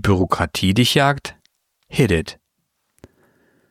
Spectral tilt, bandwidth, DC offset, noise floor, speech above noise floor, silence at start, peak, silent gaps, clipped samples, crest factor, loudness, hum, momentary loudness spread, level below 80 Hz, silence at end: -5 dB/octave; 16 kHz; under 0.1%; -72 dBFS; 55 dB; 0.05 s; 0 dBFS; none; under 0.1%; 20 dB; -18 LUFS; none; 12 LU; -40 dBFS; 1.4 s